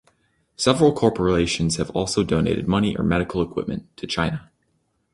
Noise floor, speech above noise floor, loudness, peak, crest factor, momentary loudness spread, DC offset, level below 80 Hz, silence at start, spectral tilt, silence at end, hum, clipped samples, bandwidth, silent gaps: -69 dBFS; 48 dB; -22 LUFS; -2 dBFS; 20 dB; 10 LU; under 0.1%; -42 dBFS; 0.6 s; -5.5 dB/octave; 0.7 s; none; under 0.1%; 11.5 kHz; none